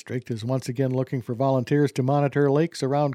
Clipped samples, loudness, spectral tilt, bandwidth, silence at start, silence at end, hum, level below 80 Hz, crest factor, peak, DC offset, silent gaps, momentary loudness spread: under 0.1%; -24 LUFS; -7.5 dB/octave; 13.5 kHz; 0.05 s; 0 s; none; -66 dBFS; 14 dB; -10 dBFS; under 0.1%; none; 7 LU